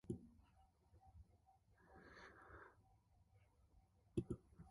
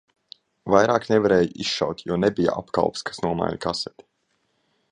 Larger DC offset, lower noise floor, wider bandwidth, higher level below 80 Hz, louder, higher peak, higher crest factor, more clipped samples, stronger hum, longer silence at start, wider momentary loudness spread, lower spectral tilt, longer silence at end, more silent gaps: neither; first, -75 dBFS vs -71 dBFS; about the same, 11 kHz vs 10.5 kHz; second, -70 dBFS vs -54 dBFS; second, -54 LUFS vs -22 LUFS; second, -30 dBFS vs -2 dBFS; about the same, 26 dB vs 22 dB; neither; neither; second, 0.05 s vs 0.65 s; first, 20 LU vs 9 LU; first, -8 dB/octave vs -5.5 dB/octave; second, 0 s vs 1.05 s; neither